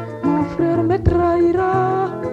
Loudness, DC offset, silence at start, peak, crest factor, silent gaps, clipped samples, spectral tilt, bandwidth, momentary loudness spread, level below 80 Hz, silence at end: -18 LUFS; under 0.1%; 0 s; -2 dBFS; 16 dB; none; under 0.1%; -9.5 dB/octave; 7.2 kHz; 4 LU; -34 dBFS; 0 s